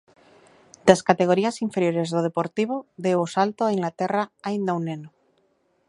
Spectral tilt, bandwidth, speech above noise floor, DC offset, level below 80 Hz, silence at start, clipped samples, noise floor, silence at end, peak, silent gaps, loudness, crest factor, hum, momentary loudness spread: -6 dB/octave; 11.5 kHz; 44 dB; under 0.1%; -68 dBFS; 0.85 s; under 0.1%; -67 dBFS; 0.8 s; 0 dBFS; none; -23 LUFS; 24 dB; none; 9 LU